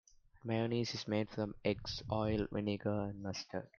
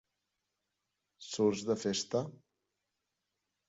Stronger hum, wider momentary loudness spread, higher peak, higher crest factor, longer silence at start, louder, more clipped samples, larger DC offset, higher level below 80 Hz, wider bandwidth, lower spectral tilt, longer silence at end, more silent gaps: neither; second, 6 LU vs 14 LU; about the same, -18 dBFS vs -18 dBFS; about the same, 20 dB vs 20 dB; second, 0.35 s vs 1.2 s; second, -38 LUFS vs -34 LUFS; neither; neither; first, -60 dBFS vs -76 dBFS; second, 7.2 kHz vs 8 kHz; about the same, -6 dB/octave vs -5 dB/octave; second, 0.1 s vs 1.4 s; neither